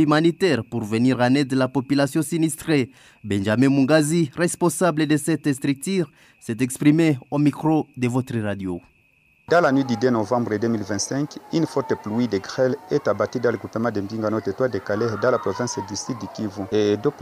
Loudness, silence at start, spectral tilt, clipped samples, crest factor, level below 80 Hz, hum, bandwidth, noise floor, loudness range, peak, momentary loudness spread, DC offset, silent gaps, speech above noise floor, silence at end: -22 LUFS; 0 s; -6 dB/octave; under 0.1%; 16 dB; -62 dBFS; none; 15.5 kHz; -60 dBFS; 3 LU; -4 dBFS; 9 LU; under 0.1%; none; 38 dB; 0 s